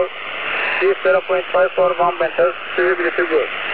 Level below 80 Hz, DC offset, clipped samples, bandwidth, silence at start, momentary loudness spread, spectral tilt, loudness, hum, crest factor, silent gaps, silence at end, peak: -60 dBFS; 1%; under 0.1%; 4.8 kHz; 0 s; 3 LU; -7.5 dB/octave; -17 LUFS; none; 14 dB; none; 0 s; -4 dBFS